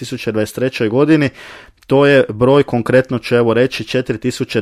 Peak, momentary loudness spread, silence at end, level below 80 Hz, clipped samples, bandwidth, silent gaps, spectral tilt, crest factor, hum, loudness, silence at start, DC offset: 0 dBFS; 8 LU; 0 s; -48 dBFS; under 0.1%; 14.5 kHz; none; -6.5 dB/octave; 14 dB; none; -14 LUFS; 0 s; under 0.1%